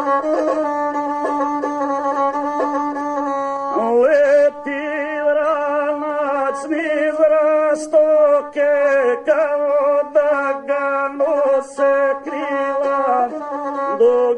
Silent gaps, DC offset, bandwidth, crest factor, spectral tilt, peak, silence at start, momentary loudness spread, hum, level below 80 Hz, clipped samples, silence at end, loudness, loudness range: none; under 0.1%; 9.8 kHz; 12 dB; -4.5 dB/octave; -4 dBFS; 0 s; 7 LU; none; -64 dBFS; under 0.1%; 0 s; -17 LUFS; 4 LU